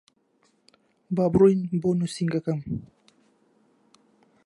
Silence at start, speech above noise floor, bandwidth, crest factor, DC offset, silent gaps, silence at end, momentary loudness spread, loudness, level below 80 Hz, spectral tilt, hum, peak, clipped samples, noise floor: 1.1 s; 44 dB; 11.5 kHz; 20 dB; under 0.1%; none; 1.6 s; 13 LU; -24 LUFS; -56 dBFS; -8 dB/octave; none; -8 dBFS; under 0.1%; -67 dBFS